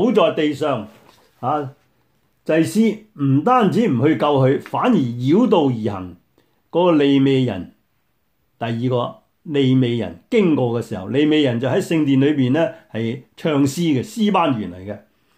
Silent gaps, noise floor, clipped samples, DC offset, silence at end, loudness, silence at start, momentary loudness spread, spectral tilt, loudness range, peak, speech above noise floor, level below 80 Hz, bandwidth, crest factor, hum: none; -68 dBFS; under 0.1%; under 0.1%; 0.4 s; -18 LUFS; 0 s; 12 LU; -7 dB/octave; 4 LU; -2 dBFS; 50 dB; -62 dBFS; 15.5 kHz; 16 dB; none